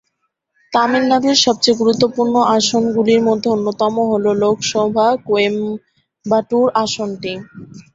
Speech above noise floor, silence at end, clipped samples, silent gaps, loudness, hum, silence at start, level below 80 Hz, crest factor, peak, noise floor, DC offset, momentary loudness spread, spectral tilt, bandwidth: 55 dB; 0.15 s; under 0.1%; none; -15 LUFS; none; 0.7 s; -58 dBFS; 16 dB; 0 dBFS; -70 dBFS; under 0.1%; 10 LU; -4 dB/octave; 8 kHz